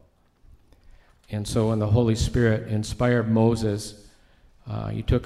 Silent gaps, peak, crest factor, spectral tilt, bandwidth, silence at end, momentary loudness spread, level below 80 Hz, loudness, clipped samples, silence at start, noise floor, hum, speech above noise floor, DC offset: none; -8 dBFS; 18 dB; -6.5 dB/octave; 12.5 kHz; 0 s; 12 LU; -38 dBFS; -24 LUFS; under 0.1%; 1.3 s; -56 dBFS; none; 34 dB; under 0.1%